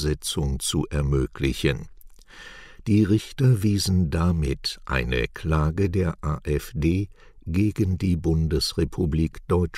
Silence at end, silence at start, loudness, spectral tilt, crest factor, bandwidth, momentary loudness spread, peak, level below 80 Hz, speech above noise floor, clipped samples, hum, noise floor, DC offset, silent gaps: 0 s; 0 s; -24 LUFS; -6 dB/octave; 16 dB; 15.5 kHz; 7 LU; -8 dBFS; -34 dBFS; 22 dB; under 0.1%; none; -45 dBFS; under 0.1%; none